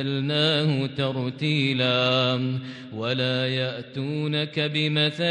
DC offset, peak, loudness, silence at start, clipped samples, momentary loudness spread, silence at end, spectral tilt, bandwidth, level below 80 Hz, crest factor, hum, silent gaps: under 0.1%; -8 dBFS; -24 LUFS; 0 s; under 0.1%; 9 LU; 0 s; -6.5 dB/octave; 9.4 kHz; -68 dBFS; 16 dB; none; none